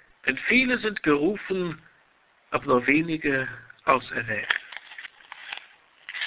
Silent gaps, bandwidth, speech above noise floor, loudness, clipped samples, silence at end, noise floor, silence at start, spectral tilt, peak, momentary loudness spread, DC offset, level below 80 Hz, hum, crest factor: none; 4 kHz; 38 dB; -24 LUFS; under 0.1%; 0 s; -62 dBFS; 0.25 s; -8.5 dB/octave; -6 dBFS; 20 LU; under 0.1%; -60 dBFS; none; 22 dB